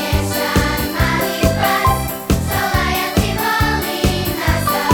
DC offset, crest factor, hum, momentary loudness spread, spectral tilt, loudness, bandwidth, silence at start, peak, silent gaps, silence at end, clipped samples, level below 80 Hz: under 0.1%; 16 dB; none; 3 LU; -4.5 dB/octave; -17 LUFS; over 20 kHz; 0 s; 0 dBFS; none; 0 s; under 0.1%; -26 dBFS